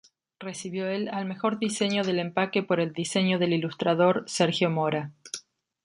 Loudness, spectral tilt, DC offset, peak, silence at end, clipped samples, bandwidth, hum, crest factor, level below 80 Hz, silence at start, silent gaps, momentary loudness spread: -26 LUFS; -5 dB/octave; under 0.1%; -8 dBFS; 0.45 s; under 0.1%; 11.5 kHz; none; 18 dB; -72 dBFS; 0.4 s; none; 13 LU